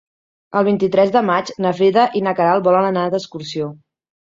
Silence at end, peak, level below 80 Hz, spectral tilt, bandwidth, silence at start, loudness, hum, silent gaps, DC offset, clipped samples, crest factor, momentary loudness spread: 0.5 s; -2 dBFS; -62 dBFS; -6.5 dB/octave; 7.6 kHz; 0.5 s; -17 LUFS; none; none; under 0.1%; under 0.1%; 16 dB; 11 LU